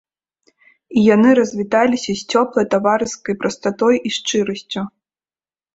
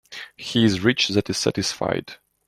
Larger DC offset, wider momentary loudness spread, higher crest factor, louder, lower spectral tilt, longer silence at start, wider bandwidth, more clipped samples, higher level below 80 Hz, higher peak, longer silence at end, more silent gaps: neither; second, 10 LU vs 15 LU; about the same, 16 dB vs 18 dB; first, -17 LUFS vs -22 LUFS; about the same, -4.5 dB/octave vs -4.5 dB/octave; first, 0.9 s vs 0.1 s; second, 8 kHz vs 13.5 kHz; neither; about the same, -58 dBFS vs -54 dBFS; about the same, -2 dBFS vs -4 dBFS; first, 0.85 s vs 0.35 s; neither